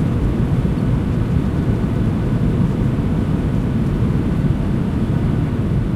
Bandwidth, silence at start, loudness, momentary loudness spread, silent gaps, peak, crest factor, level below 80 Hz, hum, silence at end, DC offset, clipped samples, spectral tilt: 12 kHz; 0 s; -18 LUFS; 1 LU; none; -4 dBFS; 12 dB; -26 dBFS; none; 0 s; under 0.1%; under 0.1%; -9 dB/octave